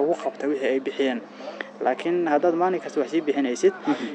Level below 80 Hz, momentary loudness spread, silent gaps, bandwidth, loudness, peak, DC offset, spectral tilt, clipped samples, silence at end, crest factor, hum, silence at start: -84 dBFS; 8 LU; none; 9 kHz; -24 LUFS; -8 dBFS; under 0.1%; -5 dB/octave; under 0.1%; 0 s; 16 dB; none; 0 s